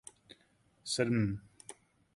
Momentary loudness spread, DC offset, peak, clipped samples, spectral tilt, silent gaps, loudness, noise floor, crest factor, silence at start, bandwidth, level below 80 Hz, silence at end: 21 LU; under 0.1%; -16 dBFS; under 0.1%; -5 dB/octave; none; -34 LUFS; -70 dBFS; 22 dB; 0.85 s; 11.5 kHz; -62 dBFS; 0.45 s